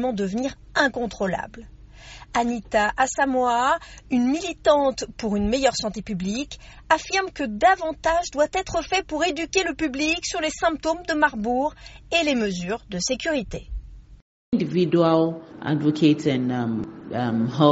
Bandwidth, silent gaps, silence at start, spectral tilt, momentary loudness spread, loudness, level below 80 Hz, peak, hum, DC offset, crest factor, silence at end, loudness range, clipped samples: 8 kHz; 14.22-14.52 s; 0 s; -4 dB/octave; 10 LU; -23 LUFS; -44 dBFS; -2 dBFS; none; under 0.1%; 22 dB; 0 s; 2 LU; under 0.1%